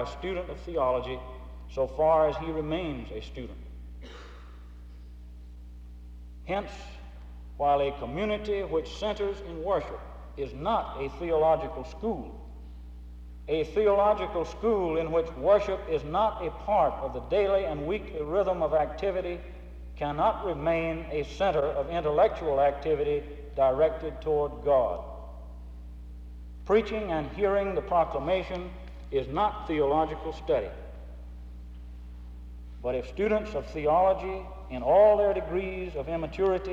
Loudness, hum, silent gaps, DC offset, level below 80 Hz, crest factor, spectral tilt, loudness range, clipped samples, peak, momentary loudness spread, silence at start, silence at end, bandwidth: -28 LUFS; 60 Hz at -45 dBFS; none; under 0.1%; -42 dBFS; 18 dB; -7 dB/octave; 8 LU; under 0.1%; -12 dBFS; 21 LU; 0 s; 0 s; 8 kHz